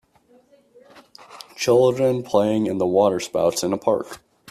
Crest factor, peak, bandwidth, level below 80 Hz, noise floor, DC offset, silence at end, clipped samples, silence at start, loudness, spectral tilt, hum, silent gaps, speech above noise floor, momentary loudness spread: 18 dB; -4 dBFS; 14 kHz; -60 dBFS; -57 dBFS; under 0.1%; 0.35 s; under 0.1%; 1.3 s; -20 LUFS; -5.5 dB/octave; none; none; 37 dB; 19 LU